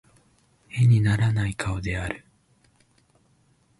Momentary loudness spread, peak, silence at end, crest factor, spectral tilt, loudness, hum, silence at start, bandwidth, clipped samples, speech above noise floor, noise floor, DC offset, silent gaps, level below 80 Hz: 15 LU; -10 dBFS; 1.6 s; 16 dB; -6.5 dB/octave; -24 LUFS; none; 0.75 s; 11.5 kHz; under 0.1%; 41 dB; -63 dBFS; under 0.1%; none; -44 dBFS